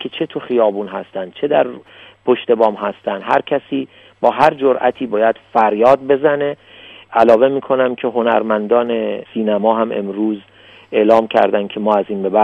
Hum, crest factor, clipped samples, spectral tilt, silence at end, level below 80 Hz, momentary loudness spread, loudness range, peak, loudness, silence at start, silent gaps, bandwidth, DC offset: none; 16 dB; under 0.1%; -7 dB/octave; 0 s; -60 dBFS; 11 LU; 3 LU; 0 dBFS; -16 LUFS; 0 s; none; 7.8 kHz; under 0.1%